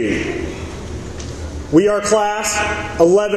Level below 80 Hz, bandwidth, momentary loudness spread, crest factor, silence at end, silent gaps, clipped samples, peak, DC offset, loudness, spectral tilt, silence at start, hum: -34 dBFS; 13 kHz; 15 LU; 16 dB; 0 s; none; under 0.1%; 0 dBFS; under 0.1%; -16 LUFS; -4.5 dB/octave; 0 s; none